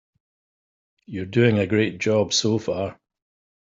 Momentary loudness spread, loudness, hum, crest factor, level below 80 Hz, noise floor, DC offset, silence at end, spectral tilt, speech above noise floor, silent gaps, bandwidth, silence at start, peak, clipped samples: 13 LU; -22 LUFS; none; 20 dB; -62 dBFS; under -90 dBFS; under 0.1%; 0.7 s; -5 dB/octave; over 69 dB; none; 8 kHz; 1.1 s; -4 dBFS; under 0.1%